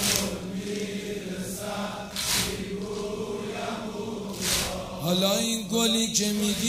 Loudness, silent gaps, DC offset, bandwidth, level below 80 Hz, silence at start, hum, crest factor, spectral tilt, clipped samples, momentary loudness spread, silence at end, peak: -27 LUFS; none; under 0.1%; 16 kHz; -50 dBFS; 0 s; none; 26 dB; -3 dB/octave; under 0.1%; 10 LU; 0 s; -2 dBFS